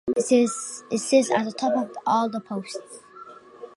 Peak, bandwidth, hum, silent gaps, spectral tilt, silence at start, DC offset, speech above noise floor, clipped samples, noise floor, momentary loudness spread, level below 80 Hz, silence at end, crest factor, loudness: -6 dBFS; 11.5 kHz; none; none; -4 dB/octave; 0.05 s; under 0.1%; 22 dB; under 0.1%; -45 dBFS; 23 LU; -70 dBFS; 0.1 s; 18 dB; -24 LUFS